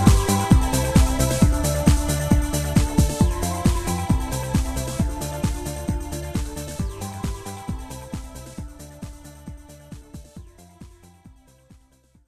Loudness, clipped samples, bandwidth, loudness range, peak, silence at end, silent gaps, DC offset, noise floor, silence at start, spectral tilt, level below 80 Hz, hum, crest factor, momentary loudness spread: -22 LUFS; under 0.1%; 14 kHz; 21 LU; 0 dBFS; 1 s; none; under 0.1%; -57 dBFS; 0 s; -5.5 dB/octave; -26 dBFS; none; 22 dB; 22 LU